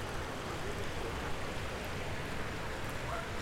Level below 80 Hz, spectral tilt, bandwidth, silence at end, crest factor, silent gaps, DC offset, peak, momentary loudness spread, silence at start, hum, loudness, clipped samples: -46 dBFS; -4.5 dB/octave; 16 kHz; 0 s; 12 dB; none; under 0.1%; -26 dBFS; 1 LU; 0 s; none; -39 LUFS; under 0.1%